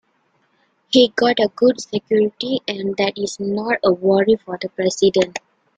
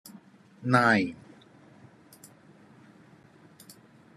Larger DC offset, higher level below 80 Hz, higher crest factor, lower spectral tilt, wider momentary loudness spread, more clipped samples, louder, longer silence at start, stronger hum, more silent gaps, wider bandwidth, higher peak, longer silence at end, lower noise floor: neither; first, -60 dBFS vs -76 dBFS; second, 18 dB vs 26 dB; second, -4.5 dB/octave vs -6 dB/octave; second, 8 LU vs 28 LU; neither; first, -18 LUFS vs -25 LUFS; first, 0.9 s vs 0.6 s; neither; neither; second, 9.2 kHz vs 13 kHz; first, -2 dBFS vs -6 dBFS; second, 0.4 s vs 3 s; first, -64 dBFS vs -56 dBFS